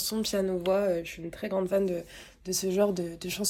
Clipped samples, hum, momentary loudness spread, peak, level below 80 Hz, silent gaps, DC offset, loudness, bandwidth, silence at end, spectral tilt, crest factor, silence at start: under 0.1%; none; 10 LU; -14 dBFS; -56 dBFS; none; under 0.1%; -29 LUFS; 17 kHz; 0 s; -4 dB/octave; 16 dB; 0 s